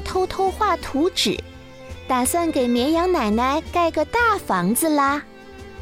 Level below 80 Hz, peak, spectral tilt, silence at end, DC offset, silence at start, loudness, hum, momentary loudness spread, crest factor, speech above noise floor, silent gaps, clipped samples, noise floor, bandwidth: -42 dBFS; -8 dBFS; -4 dB/octave; 0 s; under 0.1%; 0 s; -20 LUFS; none; 17 LU; 12 dB; 20 dB; none; under 0.1%; -40 dBFS; 16 kHz